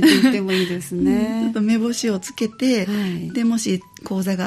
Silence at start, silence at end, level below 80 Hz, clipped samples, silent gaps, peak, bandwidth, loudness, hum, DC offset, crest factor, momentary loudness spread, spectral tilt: 0 s; 0 s; -52 dBFS; under 0.1%; none; -2 dBFS; 14 kHz; -20 LUFS; none; under 0.1%; 16 dB; 7 LU; -5 dB/octave